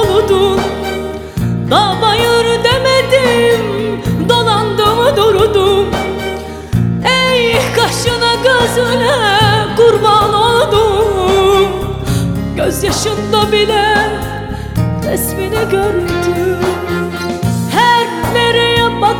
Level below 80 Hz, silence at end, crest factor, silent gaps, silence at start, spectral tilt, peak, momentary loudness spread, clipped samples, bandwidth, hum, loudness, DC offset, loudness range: -30 dBFS; 0 s; 12 dB; none; 0 s; -4.5 dB/octave; 0 dBFS; 8 LU; under 0.1%; 18.5 kHz; none; -12 LUFS; under 0.1%; 4 LU